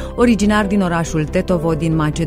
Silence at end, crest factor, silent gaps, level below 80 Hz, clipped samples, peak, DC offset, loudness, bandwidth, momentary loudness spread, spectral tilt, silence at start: 0 s; 16 dB; none; -30 dBFS; under 0.1%; 0 dBFS; under 0.1%; -16 LUFS; 15.5 kHz; 5 LU; -6.5 dB/octave; 0 s